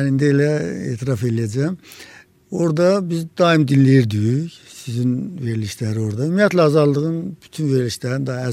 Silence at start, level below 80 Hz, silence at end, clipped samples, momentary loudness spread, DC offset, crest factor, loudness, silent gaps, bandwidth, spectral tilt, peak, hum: 0 s; -58 dBFS; 0 s; under 0.1%; 13 LU; under 0.1%; 16 dB; -18 LUFS; none; 14 kHz; -7 dB/octave; -2 dBFS; none